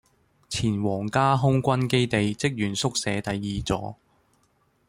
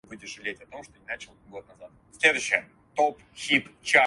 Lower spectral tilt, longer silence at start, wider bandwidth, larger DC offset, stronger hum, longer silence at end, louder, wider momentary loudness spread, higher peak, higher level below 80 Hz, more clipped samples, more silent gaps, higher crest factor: first, -5 dB/octave vs -2 dB/octave; first, 0.5 s vs 0.1 s; first, 15.5 kHz vs 11.5 kHz; neither; neither; first, 0.95 s vs 0 s; about the same, -25 LUFS vs -26 LUFS; second, 8 LU vs 22 LU; second, -8 dBFS vs -4 dBFS; first, -50 dBFS vs -66 dBFS; neither; neither; second, 18 dB vs 24 dB